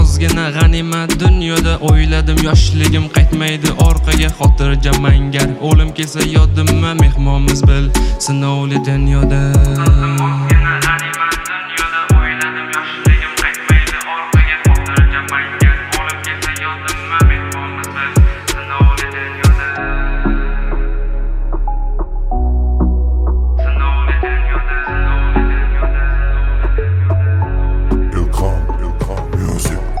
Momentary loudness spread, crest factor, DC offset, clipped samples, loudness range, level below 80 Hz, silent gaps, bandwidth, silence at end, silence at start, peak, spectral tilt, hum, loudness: 8 LU; 12 dB; under 0.1%; under 0.1%; 4 LU; -14 dBFS; none; 16 kHz; 0 s; 0 s; 0 dBFS; -5.5 dB/octave; none; -14 LUFS